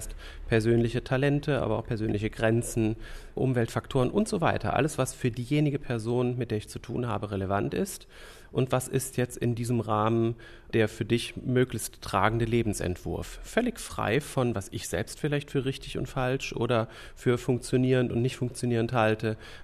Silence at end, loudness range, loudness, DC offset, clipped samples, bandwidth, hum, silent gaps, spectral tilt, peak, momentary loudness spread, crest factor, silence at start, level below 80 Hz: 0 s; 3 LU; -29 LUFS; under 0.1%; under 0.1%; 14 kHz; none; none; -6 dB/octave; -8 dBFS; 8 LU; 20 dB; 0 s; -46 dBFS